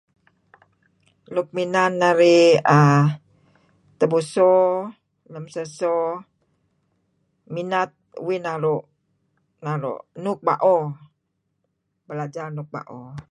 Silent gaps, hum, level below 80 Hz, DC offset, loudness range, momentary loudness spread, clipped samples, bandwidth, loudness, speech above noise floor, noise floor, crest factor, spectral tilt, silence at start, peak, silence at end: none; none; -68 dBFS; under 0.1%; 11 LU; 20 LU; under 0.1%; 11 kHz; -20 LUFS; 54 dB; -74 dBFS; 20 dB; -6.5 dB/octave; 1.3 s; -2 dBFS; 0.1 s